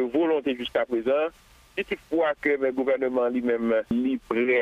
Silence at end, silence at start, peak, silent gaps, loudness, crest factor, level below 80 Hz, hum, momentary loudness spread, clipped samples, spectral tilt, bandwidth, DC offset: 0 s; 0 s; -10 dBFS; none; -25 LUFS; 14 dB; -58 dBFS; none; 7 LU; under 0.1%; -6.5 dB/octave; 11 kHz; under 0.1%